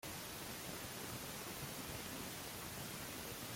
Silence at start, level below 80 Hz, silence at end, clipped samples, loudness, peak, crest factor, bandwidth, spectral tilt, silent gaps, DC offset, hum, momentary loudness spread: 0.05 s; -66 dBFS; 0 s; under 0.1%; -46 LUFS; -34 dBFS; 14 dB; 16.5 kHz; -3 dB/octave; none; under 0.1%; none; 1 LU